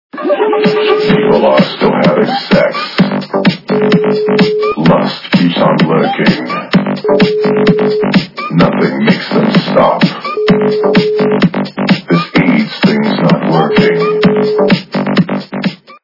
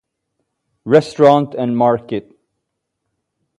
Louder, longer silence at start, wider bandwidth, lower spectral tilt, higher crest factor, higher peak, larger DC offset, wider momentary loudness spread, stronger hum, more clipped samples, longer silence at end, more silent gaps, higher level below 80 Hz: first, -11 LUFS vs -14 LUFS; second, 0.15 s vs 0.85 s; second, 6 kHz vs 11.5 kHz; about the same, -7.5 dB/octave vs -7.5 dB/octave; second, 10 dB vs 18 dB; about the same, 0 dBFS vs 0 dBFS; neither; second, 4 LU vs 15 LU; neither; first, 0.5% vs under 0.1%; second, 0.1 s vs 1.4 s; neither; first, -44 dBFS vs -60 dBFS